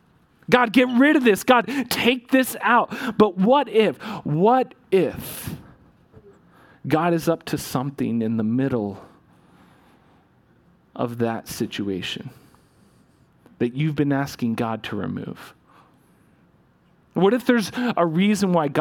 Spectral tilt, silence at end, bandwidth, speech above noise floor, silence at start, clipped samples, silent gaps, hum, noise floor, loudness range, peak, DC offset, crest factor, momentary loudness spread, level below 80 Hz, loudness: -5.5 dB/octave; 0 s; 18 kHz; 38 dB; 0.5 s; under 0.1%; none; none; -59 dBFS; 11 LU; -2 dBFS; under 0.1%; 22 dB; 15 LU; -58 dBFS; -21 LUFS